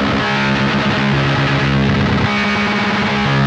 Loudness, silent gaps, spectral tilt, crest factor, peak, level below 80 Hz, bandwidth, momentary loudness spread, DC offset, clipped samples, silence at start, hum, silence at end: -15 LUFS; none; -6 dB/octave; 12 dB; -4 dBFS; -34 dBFS; 8.4 kHz; 1 LU; under 0.1%; under 0.1%; 0 s; none; 0 s